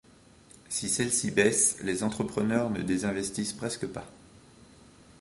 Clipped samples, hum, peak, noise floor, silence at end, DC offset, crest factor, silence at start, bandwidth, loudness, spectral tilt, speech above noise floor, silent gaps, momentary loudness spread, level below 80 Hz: under 0.1%; none; -8 dBFS; -56 dBFS; 1.05 s; under 0.1%; 24 dB; 0.7 s; 12 kHz; -28 LUFS; -3.5 dB/octave; 27 dB; none; 11 LU; -58 dBFS